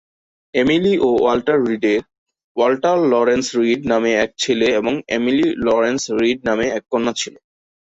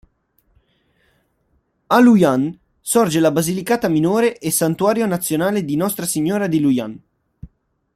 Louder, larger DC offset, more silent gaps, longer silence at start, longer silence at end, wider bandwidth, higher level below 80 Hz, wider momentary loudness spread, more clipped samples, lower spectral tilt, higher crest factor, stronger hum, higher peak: about the same, -17 LUFS vs -17 LUFS; neither; first, 2.18-2.26 s, 2.44-2.55 s vs none; second, 0.55 s vs 1.9 s; about the same, 0.55 s vs 0.5 s; second, 8 kHz vs 15.5 kHz; about the same, -52 dBFS vs -56 dBFS; second, 5 LU vs 8 LU; neither; about the same, -4.5 dB/octave vs -5 dB/octave; about the same, 14 dB vs 18 dB; neither; about the same, -2 dBFS vs -2 dBFS